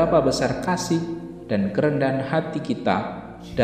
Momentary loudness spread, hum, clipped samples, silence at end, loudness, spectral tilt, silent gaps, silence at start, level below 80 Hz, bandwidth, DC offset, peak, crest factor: 11 LU; none; under 0.1%; 0 s; -23 LUFS; -6 dB/octave; none; 0 s; -48 dBFS; 15.5 kHz; 0.1%; -4 dBFS; 18 dB